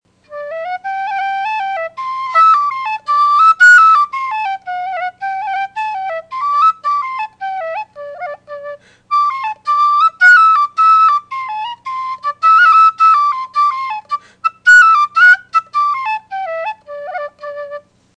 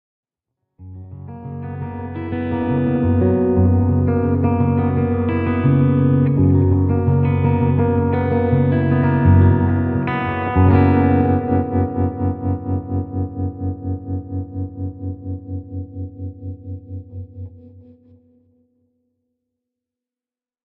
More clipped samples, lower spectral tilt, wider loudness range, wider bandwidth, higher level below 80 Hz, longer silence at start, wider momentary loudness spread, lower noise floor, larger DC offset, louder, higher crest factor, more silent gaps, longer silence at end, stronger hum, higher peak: neither; second, 0.5 dB/octave vs -9.5 dB/octave; second, 8 LU vs 16 LU; first, 10 kHz vs 3.9 kHz; second, -66 dBFS vs -40 dBFS; second, 0.3 s vs 0.8 s; first, 20 LU vs 17 LU; second, -32 dBFS vs under -90 dBFS; neither; first, -12 LUFS vs -18 LUFS; second, 12 dB vs 18 dB; neither; second, 0.4 s vs 2.85 s; neither; about the same, 0 dBFS vs -2 dBFS